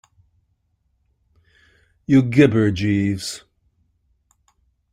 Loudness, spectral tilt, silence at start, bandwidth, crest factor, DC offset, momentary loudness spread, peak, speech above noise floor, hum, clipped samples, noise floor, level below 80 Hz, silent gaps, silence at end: -18 LUFS; -6.5 dB/octave; 2.1 s; 14.5 kHz; 20 dB; under 0.1%; 18 LU; -2 dBFS; 51 dB; none; under 0.1%; -68 dBFS; -52 dBFS; none; 1.55 s